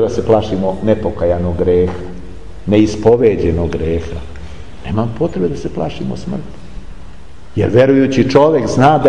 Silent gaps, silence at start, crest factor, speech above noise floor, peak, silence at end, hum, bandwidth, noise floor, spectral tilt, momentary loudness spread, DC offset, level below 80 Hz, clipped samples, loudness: none; 0 s; 14 dB; 23 dB; 0 dBFS; 0 s; none; 10 kHz; -36 dBFS; -7.5 dB/octave; 20 LU; 4%; -34 dBFS; under 0.1%; -14 LUFS